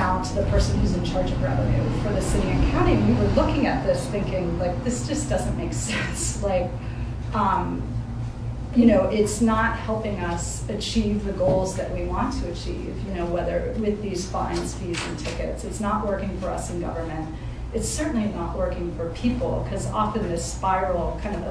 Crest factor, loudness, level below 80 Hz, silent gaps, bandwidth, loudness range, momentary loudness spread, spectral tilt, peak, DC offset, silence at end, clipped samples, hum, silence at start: 18 dB; -25 LUFS; -32 dBFS; none; 11 kHz; 5 LU; 9 LU; -6 dB/octave; -6 dBFS; under 0.1%; 0 s; under 0.1%; none; 0 s